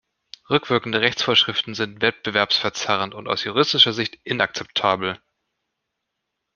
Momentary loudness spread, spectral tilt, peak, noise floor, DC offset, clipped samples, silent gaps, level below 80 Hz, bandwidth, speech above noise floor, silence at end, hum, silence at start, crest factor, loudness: 9 LU; -3.5 dB/octave; -2 dBFS; -80 dBFS; under 0.1%; under 0.1%; none; -62 dBFS; 7.2 kHz; 58 dB; 1.4 s; none; 0.5 s; 22 dB; -20 LUFS